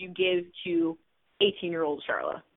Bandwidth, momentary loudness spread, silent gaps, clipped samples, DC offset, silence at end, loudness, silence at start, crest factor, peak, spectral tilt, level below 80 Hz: 4 kHz; 5 LU; none; under 0.1%; under 0.1%; 0.15 s; -29 LUFS; 0 s; 20 dB; -10 dBFS; -8.5 dB/octave; -70 dBFS